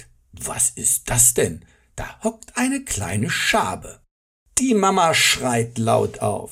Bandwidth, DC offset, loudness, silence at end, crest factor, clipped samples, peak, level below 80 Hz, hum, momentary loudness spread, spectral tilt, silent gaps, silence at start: 16 kHz; under 0.1%; -19 LUFS; 0 s; 20 dB; under 0.1%; -2 dBFS; -44 dBFS; none; 14 LU; -3 dB/octave; 4.11-4.46 s; 0 s